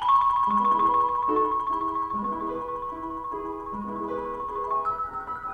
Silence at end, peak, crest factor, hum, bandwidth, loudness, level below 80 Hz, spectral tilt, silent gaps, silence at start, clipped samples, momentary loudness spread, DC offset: 0 s; -12 dBFS; 14 dB; none; 6.6 kHz; -26 LUFS; -52 dBFS; -7 dB/octave; none; 0 s; under 0.1%; 12 LU; under 0.1%